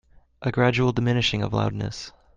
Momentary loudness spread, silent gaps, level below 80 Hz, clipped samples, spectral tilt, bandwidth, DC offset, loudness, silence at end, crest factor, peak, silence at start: 11 LU; none; -48 dBFS; under 0.1%; -6 dB/octave; 7.6 kHz; under 0.1%; -24 LUFS; 0.25 s; 18 dB; -6 dBFS; 0.4 s